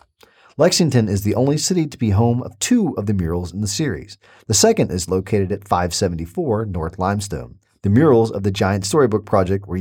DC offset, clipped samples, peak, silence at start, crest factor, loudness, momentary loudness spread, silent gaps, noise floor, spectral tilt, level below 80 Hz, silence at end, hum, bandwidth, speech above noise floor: under 0.1%; under 0.1%; -2 dBFS; 0.6 s; 16 dB; -18 LUFS; 9 LU; none; -52 dBFS; -5 dB/octave; -42 dBFS; 0 s; none; 17.5 kHz; 34 dB